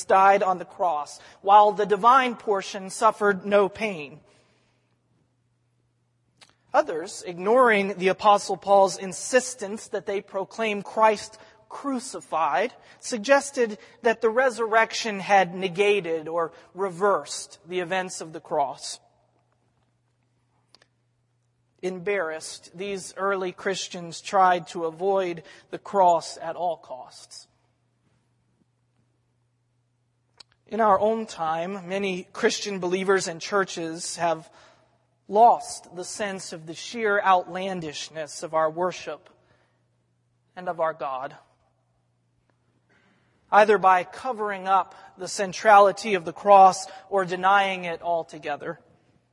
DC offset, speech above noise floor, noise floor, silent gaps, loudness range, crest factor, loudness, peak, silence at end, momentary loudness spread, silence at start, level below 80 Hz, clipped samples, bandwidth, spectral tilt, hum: under 0.1%; 47 dB; -70 dBFS; none; 13 LU; 22 dB; -23 LUFS; -4 dBFS; 0.55 s; 17 LU; 0 s; -74 dBFS; under 0.1%; 11.5 kHz; -3.5 dB/octave; none